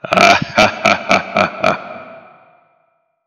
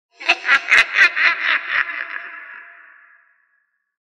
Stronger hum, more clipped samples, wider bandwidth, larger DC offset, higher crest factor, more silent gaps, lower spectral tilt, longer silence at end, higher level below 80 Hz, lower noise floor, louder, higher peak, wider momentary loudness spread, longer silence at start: neither; first, 0.1% vs under 0.1%; about the same, 16 kHz vs 15 kHz; neither; about the same, 16 dB vs 20 dB; neither; first, -3.5 dB/octave vs 0.5 dB/octave; second, 1.1 s vs 1.5 s; first, -50 dBFS vs -64 dBFS; second, -62 dBFS vs -67 dBFS; about the same, -13 LUFS vs -15 LUFS; about the same, 0 dBFS vs 0 dBFS; second, 15 LU vs 20 LU; second, 0.05 s vs 0.2 s